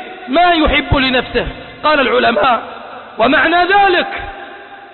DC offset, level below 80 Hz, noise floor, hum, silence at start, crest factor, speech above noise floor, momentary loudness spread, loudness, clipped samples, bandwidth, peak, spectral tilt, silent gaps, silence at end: under 0.1%; -30 dBFS; -33 dBFS; none; 0 s; 12 dB; 21 dB; 19 LU; -12 LUFS; under 0.1%; 4.4 kHz; -2 dBFS; -10 dB/octave; none; 0.05 s